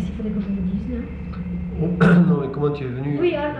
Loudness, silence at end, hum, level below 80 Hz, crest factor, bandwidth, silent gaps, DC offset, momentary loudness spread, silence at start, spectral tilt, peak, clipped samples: -21 LUFS; 0 s; none; -36 dBFS; 16 dB; 5.4 kHz; none; under 0.1%; 14 LU; 0 s; -9.5 dB/octave; -4 dBFS; under 0.1%